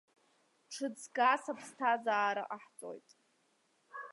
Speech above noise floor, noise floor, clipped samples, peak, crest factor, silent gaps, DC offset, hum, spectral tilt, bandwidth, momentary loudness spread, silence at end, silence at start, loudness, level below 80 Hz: 40 dB; -75 dBFS; under 0.1%; -16 dBFS; 22 dB; none; under 0.1%; none; -2.5 dB/octave; 11.5 kHz; 19 LU; 0 s; 0.7 s; -34 LUFS; under -90 dBFS